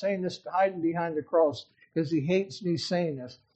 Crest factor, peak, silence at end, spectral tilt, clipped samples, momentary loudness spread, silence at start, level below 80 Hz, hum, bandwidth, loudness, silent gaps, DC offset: 16 dB; -12 dBFS; 0.2 s; -6.5 dB/octave; under 0.1%; 8 LU; 0 s; -72 dBFS; none; 8.4 kHz; -29 LUFS; none; under 0.1%